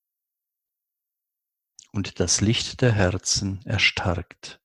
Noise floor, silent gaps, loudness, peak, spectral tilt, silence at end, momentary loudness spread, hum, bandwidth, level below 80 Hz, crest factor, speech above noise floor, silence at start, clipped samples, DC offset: -85 dBFS; none; -23 LUFS; -6 dBFS; -3.5 dB/octave; 0.1 s; 11 LU; none; 12 kHz; -42 dBFS; 20 dB; 62 dB; 1.95 s; under 0.1%; under 0.1%